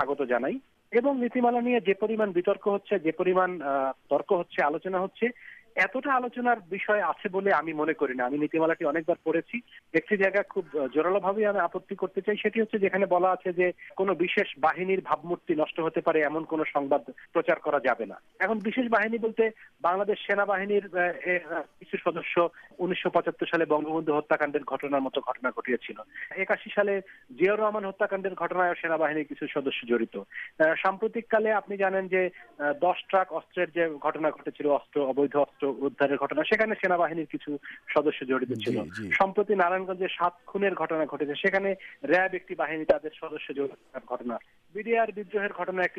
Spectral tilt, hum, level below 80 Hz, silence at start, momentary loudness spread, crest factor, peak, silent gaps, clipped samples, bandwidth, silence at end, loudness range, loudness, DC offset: -7 dB/octave; none; -70 dBFS; 0 s; 7 LU; 16 dB; -10 dBFS; none; under 0.1%; 7.6 kHz; 0 s; 2 LU; -28 LUFS; under 0.1%